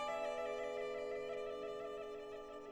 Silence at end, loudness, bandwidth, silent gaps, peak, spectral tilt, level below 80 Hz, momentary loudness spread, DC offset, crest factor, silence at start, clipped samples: 0 s; -45 LUFS; 15 kHz; none; -30 dBFS; -3.5 dB/octave; -72 dBFS; 8 LU; under 0.1%; 14 dB; 0 s; under 0.1%